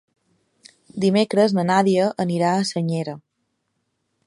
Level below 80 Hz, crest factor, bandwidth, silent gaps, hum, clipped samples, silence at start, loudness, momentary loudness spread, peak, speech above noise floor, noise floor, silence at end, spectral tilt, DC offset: -68 dBFS; 18 dB; 11.5 kHz; none; none; under 0.1%; 0.95 s; -20 LUFS; 12 LU; -4 dBFS; 54 dB; -73 dBFS; 1.05 s; -6 dB/octave; under 0.1%